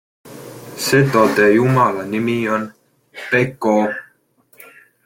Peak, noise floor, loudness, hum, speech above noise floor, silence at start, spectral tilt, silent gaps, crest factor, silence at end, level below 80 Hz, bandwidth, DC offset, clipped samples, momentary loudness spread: -2 dBFS; -56 dBFS; -16 LUFS; none; 41 dB; 0.25 s; -5.5 dB/octave; none; 16 dB; 1.05 s; -56 dBFS; 17 kHz; under 0.1%; under 0.1%; 21 LU